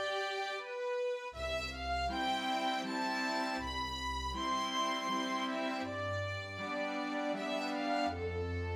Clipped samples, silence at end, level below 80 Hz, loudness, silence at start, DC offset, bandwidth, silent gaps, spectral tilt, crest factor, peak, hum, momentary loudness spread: under 0.1%; 0 s; -54 dBFS; -36 LUFS; 0 s; under 0.1%; 16.5 kHz; none; -4 dB/octave; 14 dB; -22 dBFS; none; 4 LU